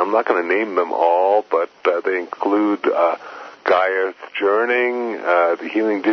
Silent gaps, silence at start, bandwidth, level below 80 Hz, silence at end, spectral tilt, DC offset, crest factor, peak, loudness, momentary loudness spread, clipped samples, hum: none; 0 s; 6.4 kHz; -72 dBFS; 0 s; -5.5 dB/octave; under 0.1%; 16 dB; -2 dBFS; -19 LUFS; 6 LU; under 0.1%; none